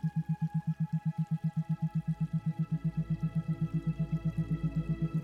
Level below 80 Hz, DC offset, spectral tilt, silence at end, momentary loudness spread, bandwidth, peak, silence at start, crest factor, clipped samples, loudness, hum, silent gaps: -52 dBFS; under 0.1%; -10 dB/octave; 0 s; 1 LU; 4.2 kHz; -22 dBFS; 0 s; 10 dB; under 0.1%; -34 LUFS; none; none